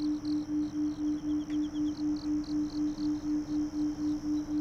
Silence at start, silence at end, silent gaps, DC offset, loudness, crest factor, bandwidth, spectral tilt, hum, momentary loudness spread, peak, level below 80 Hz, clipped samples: 0 s; 0 s; none; under 0.1%; -33 LUFS; 8 dB; 7.2 kHz; -6.5 dB/octave; none; 1 LU; -24 dBFS; -54 dBFS; under 0.1%